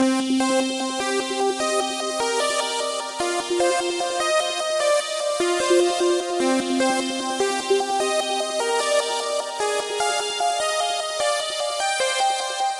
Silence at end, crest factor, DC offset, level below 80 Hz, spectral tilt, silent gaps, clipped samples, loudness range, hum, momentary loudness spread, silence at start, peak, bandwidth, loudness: 0 s; 14 dB; under 0.1%; -66 dBFS; -1 dB/octave; none; under 0.1%; 2 LU; none; 4 LU; 0 s; -8 dBFS; 11.5 kHz; -22 LUFS